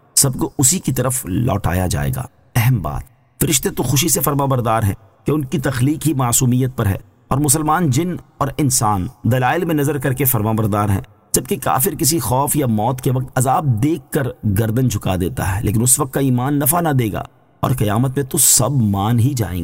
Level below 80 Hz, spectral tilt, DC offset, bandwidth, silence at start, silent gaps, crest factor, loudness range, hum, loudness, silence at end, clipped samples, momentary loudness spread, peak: -38 dBFS; -4.5 dB/octave; under 0.1%; 16.5 kHz; 0.15 s; none; 16 dB; 2 LU; none; -17 LUFS; 0 s; under 0.1%; 7 LU; -2 dBFS